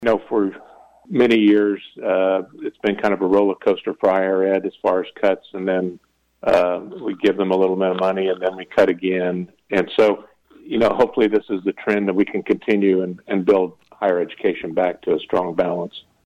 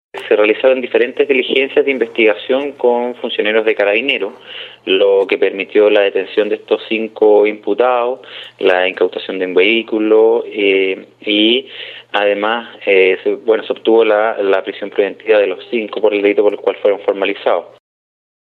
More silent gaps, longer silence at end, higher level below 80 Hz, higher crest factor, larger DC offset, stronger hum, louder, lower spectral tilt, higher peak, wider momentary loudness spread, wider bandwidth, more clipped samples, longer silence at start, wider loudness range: neither; second, 0.25 s vs 0.8 s; first, -58 dBFS vs -72 dBFS; about the same, 14 dB vs 14 dB; neither; neither; second, -20 LUFS vs -14 LUFS; first, -7 dB/octave vs -5.5 dB/octave; second, -6 dBFS vs 0 dBFS; about the same, 7 LU vs 8 LU; first, 9 kHz vs 4.5 kHz; neither; second, 0 s vs 0.15 s; about the same, 2 LU vs 2 LU